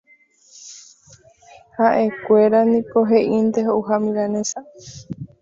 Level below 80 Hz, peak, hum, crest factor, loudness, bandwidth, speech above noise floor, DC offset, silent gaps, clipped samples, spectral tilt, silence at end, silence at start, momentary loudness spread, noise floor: -60 dBFS; -2 dBFS; none; 16 dB; -18 LUFS; 7.8 kHz; 37 dB; under 0.1%; none; under 0.1%; -5.5 dB/octave; 0.15 s; 0.6 s; 23 LU; -54 dBFS